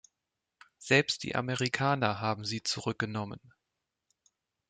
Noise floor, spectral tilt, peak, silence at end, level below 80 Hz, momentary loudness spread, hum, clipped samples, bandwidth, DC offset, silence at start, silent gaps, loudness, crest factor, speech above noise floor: -87 dBFS; -4.5 dB/octave; -10 dBFS; 1.35 s; -68 dBFS; 13 LU; none; under 0.1%; 9.4 kHz; under 0.1%; 0.8 s; none; -30 LUFS; 24 dB; 56 dB